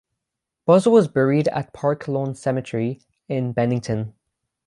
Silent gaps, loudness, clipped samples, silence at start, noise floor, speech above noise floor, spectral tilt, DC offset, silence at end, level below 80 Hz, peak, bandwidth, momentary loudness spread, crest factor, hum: none; -21 LUFS; under 0.1%; 0.65 s; -83 dBFS; 63 dB; -7.5 dB/octave; under 0.1%; 0.55 s; -58 dBFS; -4 dBFS; 11.5 kHz; 12 LU; 18 dB; none